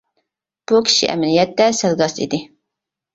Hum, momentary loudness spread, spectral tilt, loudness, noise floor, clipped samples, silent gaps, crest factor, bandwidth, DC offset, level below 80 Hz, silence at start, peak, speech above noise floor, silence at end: none; 10 LU; -3.5 dB/octave; -16 LUFS; -82 dBFS; under 0.1%; none; 16 dB; 8 kHz; under 0.1%; -58 dBFS; 0.7 s; -2 dBFS; 66 dB; 0.7 s